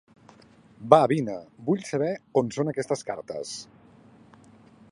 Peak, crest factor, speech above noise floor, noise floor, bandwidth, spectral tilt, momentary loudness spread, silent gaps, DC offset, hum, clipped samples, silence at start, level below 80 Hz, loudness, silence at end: 0 dBFS; 26 dB; 29 dB; -54 dBFS; 11.5 kHz; -6 dB/octave; 16 LU; none; under 0.1%; none; under 0.1%; 0.8 s; -70 dBFS; -26 LUFS; 1.25 s